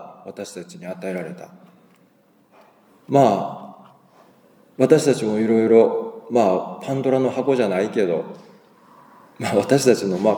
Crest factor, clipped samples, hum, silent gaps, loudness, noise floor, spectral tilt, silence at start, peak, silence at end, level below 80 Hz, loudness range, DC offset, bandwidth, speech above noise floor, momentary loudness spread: 20 dB; under 0.1%; none; none; -19 LUFS; -57 dBFS; -6 dB/octave; 0 s; 0 dBFS; 0 s; -74 dBFS; 6 LU; under 0.1%; 19.5 kHz; 38 dB; 19 LU